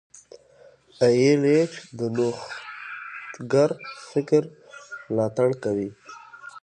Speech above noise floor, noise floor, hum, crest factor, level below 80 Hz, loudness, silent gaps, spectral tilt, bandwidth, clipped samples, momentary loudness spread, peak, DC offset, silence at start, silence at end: 31 dB; -54 dBFS; none; 18 dB; -68 dBFS; -23 LUFS; none; -6.5 dB/octave; 9.6 kHz; under 0.1%; 21 LU; -6 dBFS; under 0.1%; 1 s; 0.05 s